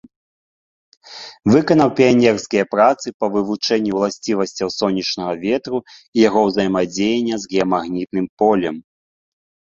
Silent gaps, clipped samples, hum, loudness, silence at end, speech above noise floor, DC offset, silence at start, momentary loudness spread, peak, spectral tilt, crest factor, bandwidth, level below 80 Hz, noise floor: 3.14-3.20 s, 6.08-6.13 s, 8.29-8.37 s; under 0.1%; none; -18 LUFS; 0.95 s; over 73 dB; under 0.1%; 1.05 s; 10 LU; -2 dBFS; -5.5 dB/octave; 16 dB; 7.8 kHz; -56 dBFS; under -90 dBFS